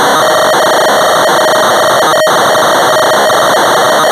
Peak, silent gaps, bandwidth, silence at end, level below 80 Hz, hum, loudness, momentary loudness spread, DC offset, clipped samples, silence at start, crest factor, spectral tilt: -2 dBFS; none; 16 kHz; 0 s; -54 dBFS; none; -7 LUFS; 0 LU; under 0.1%; under 0.1%; 0 s; 4 dB; -2 dB/octave